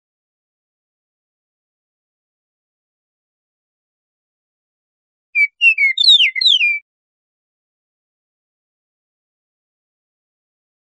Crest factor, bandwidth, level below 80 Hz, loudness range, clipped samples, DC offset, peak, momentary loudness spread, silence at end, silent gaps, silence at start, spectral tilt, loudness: 20 dB; 10.5 kHz; under -90 dBFS; 10 LU; under 0.1%; under 0.1%; -2 dBFS; 9 LU; 4.2 s; none; 5.35 s; 12.5 dB/octave; -11 LUFS